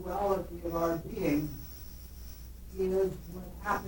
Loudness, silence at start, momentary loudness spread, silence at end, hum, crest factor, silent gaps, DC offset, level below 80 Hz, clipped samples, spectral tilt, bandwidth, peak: -33 LUFS; 0 s; 17 LU; 0 s; none; 18 dB; none; under 0.1%; -46 dBFS; under 0.1%; -6.5 dB/octave; 17.5 kHz; -16 dBFS